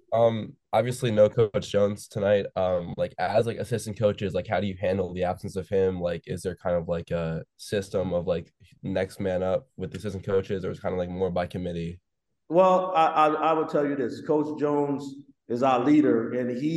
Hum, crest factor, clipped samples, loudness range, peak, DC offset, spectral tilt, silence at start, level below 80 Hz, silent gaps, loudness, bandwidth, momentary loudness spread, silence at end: none; 18 dB; under 0.1%; 6 LU; -8 dBFS; under 0.1%; -7 dB/octave; 0.1 s; -56 dBFS; none; -26 LUFS; 12.5 kHz; 11 LU; 0 s